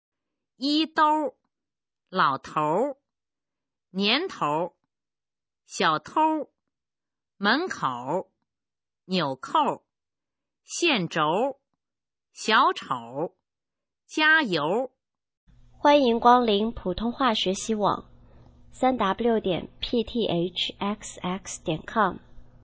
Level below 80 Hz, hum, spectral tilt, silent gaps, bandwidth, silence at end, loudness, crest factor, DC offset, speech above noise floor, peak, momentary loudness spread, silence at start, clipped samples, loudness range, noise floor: -56 dBFS; none; -4 dB/octave; 15.37-15.47 s; 8 kHz; 0.2 s; -25 LUFS; 22 dB; under 0.1%; over 66 dB; -4 dBFS; 13 LU; 0.6 s; under 0.1%; 5 LU; under -90 dBFS